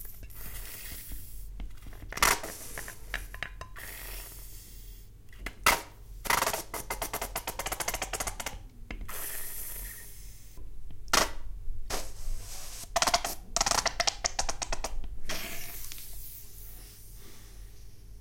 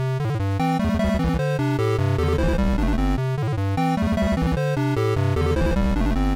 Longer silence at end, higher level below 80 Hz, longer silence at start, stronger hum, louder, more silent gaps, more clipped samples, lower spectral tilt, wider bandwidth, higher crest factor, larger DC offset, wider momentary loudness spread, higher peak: about the same, 0 s vs 0 s; second, -42 dBFS vs -28 dBFS; about the same, 0 s vs 0 s; neither; second, -32 LUFS vs -22 LUFS; neither; neither; second, -1 dB/octave vs -7.5 dB/octave; about the same, 17 kHz vs 16 kHz; first, 28 dB vs 8 dB; second, under 0.1% vs 0.1%; first, 23 LU vs 2 LU; first, -6 dBFS vs -12 dBFS